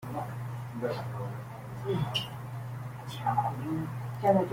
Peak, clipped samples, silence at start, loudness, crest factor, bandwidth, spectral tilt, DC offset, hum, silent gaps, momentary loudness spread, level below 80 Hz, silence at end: -12 dBFS; under 0.1%; 0 s; -34 LUFS; 22 dB; 16.5 kHz; -6.5 dB/octave; under 0.1%; none; none; 10 LU; -62 dBFS; 0 s